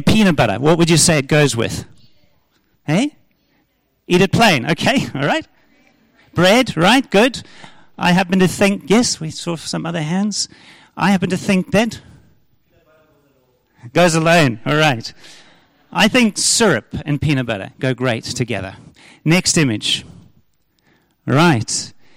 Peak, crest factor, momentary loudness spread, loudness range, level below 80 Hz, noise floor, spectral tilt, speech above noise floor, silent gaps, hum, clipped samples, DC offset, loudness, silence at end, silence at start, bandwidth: -2 dBFS; 14 dB; 11 LU; 5 LU; -44 dBFS; -63 dBFS; -4.5 dB/octave; 48 dB; none; none; under 0.1%; under 0.1%; -16 LUFS; 0.3 s; 0 s; 16.5 kHz